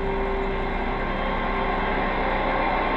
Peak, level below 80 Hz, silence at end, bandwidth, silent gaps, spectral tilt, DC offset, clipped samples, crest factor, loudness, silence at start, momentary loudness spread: -12 dBFS; -30 dBFS; 0 s; 5.6 kHz; none; -7.5 dB/octave; under 0.1%; under 0.1%; 12 dB; -25 LUFS; 0 s; 4 LU